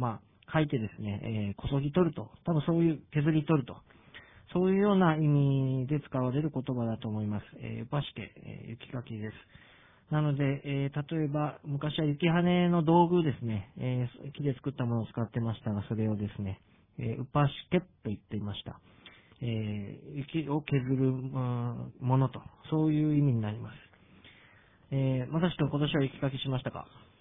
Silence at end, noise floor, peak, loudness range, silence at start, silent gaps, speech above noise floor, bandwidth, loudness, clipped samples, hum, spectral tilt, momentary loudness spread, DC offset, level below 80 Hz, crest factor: 0.2 s; -60 dBFS; -12 dBFS; 7 LU; 0 s; none; 30 dB; 3.9 kHz; -31 LUFS; under 0.1%; none; -11.5 dB/octave; 14 LU; under 0.1%; -58 dBFS; 20 dB